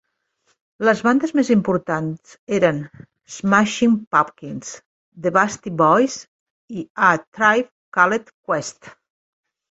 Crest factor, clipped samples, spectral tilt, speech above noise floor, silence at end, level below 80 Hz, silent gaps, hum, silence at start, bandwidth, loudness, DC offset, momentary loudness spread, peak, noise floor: 20 dB; under 0.1%; -5 dB/octave; 48 dB; 0.8 s; -60 dBFS; 2.39-2.47 s, 4.07-4.11 s, 4.86-5.12 s, 6.28-6.68 s, 6.90-6.95 s, 7.27-7.32 s, 7.72-7.92 s, 8.34-8.43 s; none; 0.8 s; 8.2 kHz; -19 LUFS; under 0.1%; 16 LU; -2 dBFS; -67 dBFS